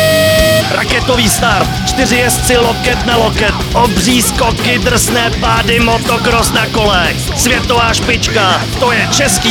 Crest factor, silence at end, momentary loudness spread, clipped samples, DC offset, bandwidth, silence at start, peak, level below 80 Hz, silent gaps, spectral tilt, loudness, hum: 10 dB; 0 s; 3 LU; under 0.1%; under 0.1%; over 20 kHz; 0 s; 0 dBFS; -22 dBFS; none; -3.5 dB/octave; -10 LUFS; none